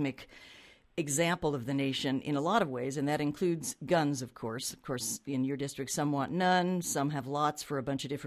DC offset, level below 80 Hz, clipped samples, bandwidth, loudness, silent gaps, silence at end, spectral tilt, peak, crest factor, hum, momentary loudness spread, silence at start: under 0.1%; -66 dBFS; under 0.1%; 15 kHz; -32 LUFS; none; 0 s; -4.5 dB/octave; -12 dBFS; 20 dB; none; 8 LU; 0 s